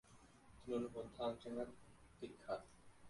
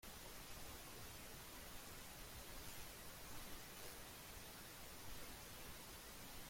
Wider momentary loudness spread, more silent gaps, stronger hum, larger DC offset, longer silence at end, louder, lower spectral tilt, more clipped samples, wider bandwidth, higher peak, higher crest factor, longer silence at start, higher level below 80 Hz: first, 21 LU vs 1 LU; neither; first, 60 Hz at -70 dBFS vs none; neither; about the same, 0 s vs 0 s; first, -48 LUFS vs -55 LUFS; first, -6 dB/octave vs -2.5 dB/octave; neither; second, 11.5 kHz vs 16.5 kHz; first, -30 dBFS vs -38 dBFS; about the same, 18 dB vs 18 dB; about the same, 0.05 s vs 0 s; second, -72 dBFS vs -64 dBFS